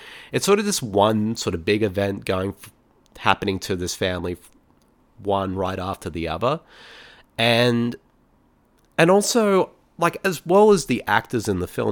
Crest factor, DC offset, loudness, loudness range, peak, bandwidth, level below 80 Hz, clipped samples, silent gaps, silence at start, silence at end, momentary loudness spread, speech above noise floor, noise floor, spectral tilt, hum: 22 dB; under 0.1%; -21 LUFS; 7 LU; 0 dBFS; 19 kHz; -50 dBFS; under 0.1%; none; 0 s; 0 s; 12 LU; 39 dB; -60 dBFS; -4.5 dB/octave; none